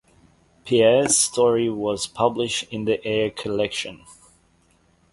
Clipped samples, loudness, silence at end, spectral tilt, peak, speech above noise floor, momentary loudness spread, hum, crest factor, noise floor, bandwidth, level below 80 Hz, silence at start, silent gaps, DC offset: under 0.1%; -21 LUFS; 1 s; -3 dB/octave; -4 dBFS; 39 dB; 9 LU; none; 18 dB; -61 dBFS; 11.5 kHz; -56 dBFS; 0.65 s; none; under 0.1%